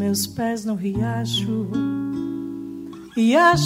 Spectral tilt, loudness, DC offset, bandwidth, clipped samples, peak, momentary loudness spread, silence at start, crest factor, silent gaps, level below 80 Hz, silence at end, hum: -5 dB/octave; -22 LUFS; under 0.1%; 16 kHz; under 0.1%; -4 dBFS; 14 LU; 0 s; 18 dB; none; -50 dBFS; 0 s; none